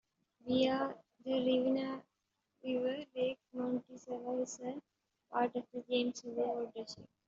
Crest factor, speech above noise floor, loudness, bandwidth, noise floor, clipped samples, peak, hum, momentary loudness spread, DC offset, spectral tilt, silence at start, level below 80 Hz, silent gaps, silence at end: 18 dB; 49 dB; -37 LUFS; 7.6 kHz; -85 dBFS; under 0.1%; -20 dBFS; none; 14 LU; under 0.1%; -3.5 dB/octave; 0.45 s; -80 dBFS; none; 0.25 s